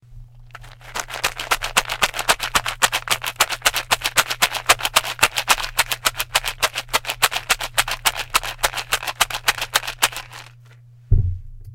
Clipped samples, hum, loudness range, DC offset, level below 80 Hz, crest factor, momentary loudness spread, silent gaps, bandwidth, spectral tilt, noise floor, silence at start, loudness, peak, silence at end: under 0.1%; none; 3 LU; under 0.1%; -34 dBFS; 22 dB; 6 LU; none; 17.5 kHz; -1 dB/octave; -46 dBFS; 0.1 s; -20 LUFS; 0 dBFS; 0 s